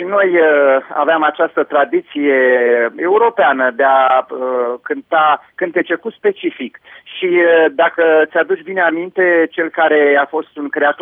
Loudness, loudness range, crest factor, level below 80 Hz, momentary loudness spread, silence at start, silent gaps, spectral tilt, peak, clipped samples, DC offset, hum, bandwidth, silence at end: -14 LUFS; 3 LU; 10 dB; -74 dBFS; 9 LU; 0 s; none; -7.5 dB/octave; -2 dBFS; under 0.1%; under 0.1%; none; 3.8 kHz; 0 s